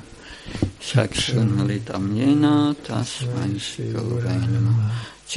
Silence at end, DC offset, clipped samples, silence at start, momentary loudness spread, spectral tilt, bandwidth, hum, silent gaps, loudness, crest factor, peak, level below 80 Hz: 0 s; under 0.1%; under 0.1%; 0 s; 10 LU; -6 dB/octave; 11.5 kHz; none; none; -22 LUFS; 18 dB; -2 dBFS; -46 dBFS